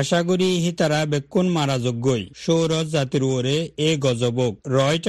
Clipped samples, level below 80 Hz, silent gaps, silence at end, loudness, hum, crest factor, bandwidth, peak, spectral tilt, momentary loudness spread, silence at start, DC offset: under 0.1%; -56 dBFS; none; 0 s; -21 LUFS; none; 16 dB; 12.5 kHz; -6 dBFS; -5.5 dB/octave; 3 LU; 0 s; under 0.1%